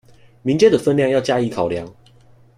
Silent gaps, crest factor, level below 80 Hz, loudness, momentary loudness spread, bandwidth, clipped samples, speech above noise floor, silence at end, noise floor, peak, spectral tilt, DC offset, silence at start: none; 16 dB; -54 dBFS; -18 LUFS; 13 LU; 11.5 kHz; under 0.1%; 32 dB; 0.65 s; -49 dBFS; -2 dBFS; -6 dB/octave; under 0.1%; 0.45 s